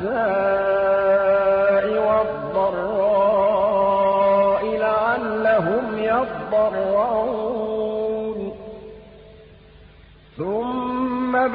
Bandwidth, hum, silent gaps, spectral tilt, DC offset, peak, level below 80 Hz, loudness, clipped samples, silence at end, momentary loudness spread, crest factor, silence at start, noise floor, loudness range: 5 kHz; none; none; -10.5 dB/octave; under 0.1%; -8 dBFS; -50 dBFS; -20 LUFS; under 0.1%; 0 s; 8 LU; 12 dB; 0 s; -48 dBFS; 10 LU